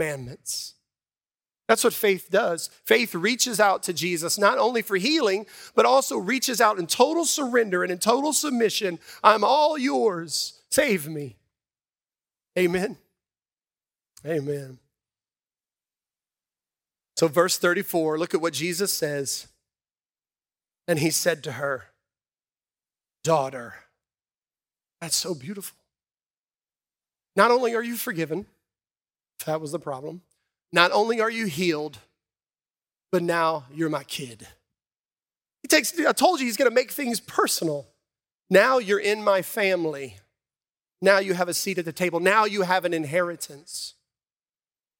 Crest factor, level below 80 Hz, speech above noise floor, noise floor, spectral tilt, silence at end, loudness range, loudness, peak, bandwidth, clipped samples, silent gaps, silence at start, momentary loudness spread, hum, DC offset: 26 dB; -70 dBFS; over 67 dB; under -90 dBFS; -3 dB/octave; 1.1 s; 10 LU; -23 LUFS; 0 dBFS; 17 kHz; under 0.1%; 26.30-26.44 s, 35.00-35.04 s; 0 s; 14 LU; none; under 0.1%